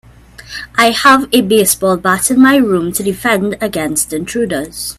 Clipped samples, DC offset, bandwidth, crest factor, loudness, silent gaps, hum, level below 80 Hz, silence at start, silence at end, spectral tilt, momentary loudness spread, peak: under 0.1%; under 0.1%; 16 kHz; 12 dB; -12 LUFS; none; 60 Hz at -40 dBFS; -44 dBFS; 0.45 s; 0.05 s; -3.5 dB/octave; 10 LU; 0 dBFS